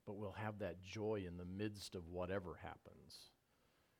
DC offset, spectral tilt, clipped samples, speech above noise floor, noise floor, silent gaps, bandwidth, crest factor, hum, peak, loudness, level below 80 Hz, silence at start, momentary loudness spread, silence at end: under 0.1%; -6 dB/octave; under 0.1%; 30 dB; -78 dBFS; none; 19 kHz; 18 dB; none; -30 dBFS; -48 LUFS; -70 dBFS; 0.05 s; 15 LU; 0.7 s